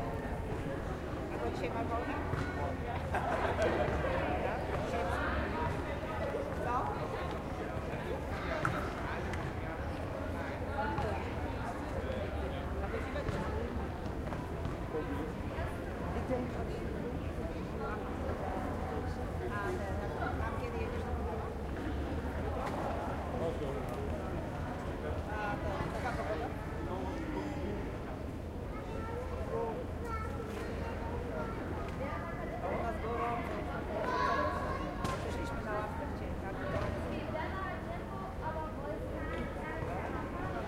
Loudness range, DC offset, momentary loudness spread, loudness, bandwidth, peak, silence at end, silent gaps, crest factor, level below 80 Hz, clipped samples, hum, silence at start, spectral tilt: 4 LU; under 0.1%; 5 LU; -38 LUFS; 16 kHz; -18 dBFS; 0 s; none; 18 dB; -44 dBFS; under 0.1%; none; 0 s; -7 dB/octave